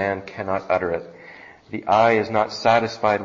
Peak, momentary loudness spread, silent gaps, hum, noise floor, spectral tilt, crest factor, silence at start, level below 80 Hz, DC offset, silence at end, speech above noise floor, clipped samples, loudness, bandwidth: -6 dBFS; 19 LU; none; none; -44 dBFS; -5.5 dB/octave; 16 dB; 0 s; -58 dBFS; under 0.1%; 0 s; 23 dB; under 0.1%; -21 LUFS; 7.6 kHz